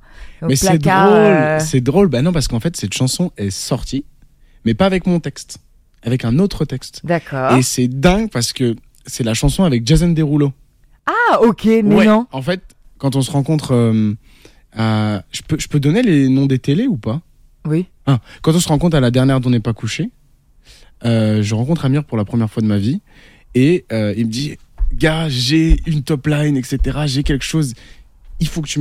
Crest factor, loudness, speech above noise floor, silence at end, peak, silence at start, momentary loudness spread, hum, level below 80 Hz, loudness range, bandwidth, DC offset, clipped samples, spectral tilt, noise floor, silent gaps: 16 dB; -16 LUFS; 35 dB; 0 s; 0 dBFS; 0.2 s; 11 LU; none; -30 dBFS; 4 LU; 15.5 kHz; under 0.1%; under 0.1%; -6 dB/octave; -50 dBFS; none